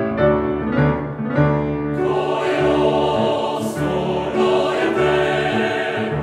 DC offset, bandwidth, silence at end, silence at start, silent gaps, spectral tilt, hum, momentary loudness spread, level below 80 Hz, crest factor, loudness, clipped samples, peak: under 0.1%; 13.5 kHz; 0 s; 0 s; none; -6.5 dB/octave; none; 4 LU; -40 dBFS; 16 dB; -19 LUFS; under 0.1%; -2 dBFS